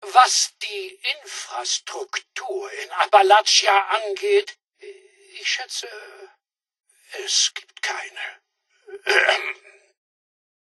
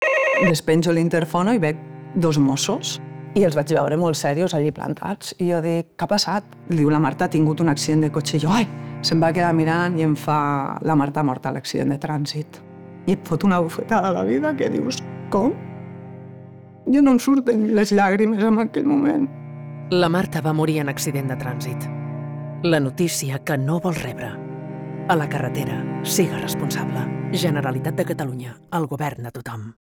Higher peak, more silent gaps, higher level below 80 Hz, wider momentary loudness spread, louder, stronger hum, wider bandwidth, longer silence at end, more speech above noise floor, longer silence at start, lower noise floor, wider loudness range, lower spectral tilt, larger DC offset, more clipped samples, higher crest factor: first, 0 dBFS vs -4 dBFS; neither; second, -86 dBFS vs -54 dBFS; first, 18 LU vs 13 LU; about the same, -20 LUFS vs -21 LUFS; neither; second, 12 kHz vs 20 kHz; first, 1.15 s vs 0.2 s; first, 30 dB vs 21 dB; about the same, 0 s vs 0 s; first, -51 dBFS vs -41 dBFS; about the same, 7 LU vs 5 LU; second, 3 dB/octave vs -5.5 dB/octave; neither; neither; first, 22 dB vs 16 dB